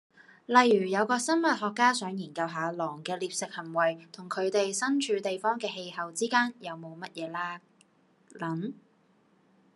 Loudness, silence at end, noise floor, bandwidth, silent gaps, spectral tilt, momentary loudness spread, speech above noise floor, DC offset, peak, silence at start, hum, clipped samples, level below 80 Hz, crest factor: -29 LUFS; 1 s; -66 dBFS; 12.5 kHz; none; -3.5 dB/octave; 14 LU; 37 dB; under 0.1%; -6 dBFS; 0.5 s; none; under 0.1%; -88 dBFS; 26 dB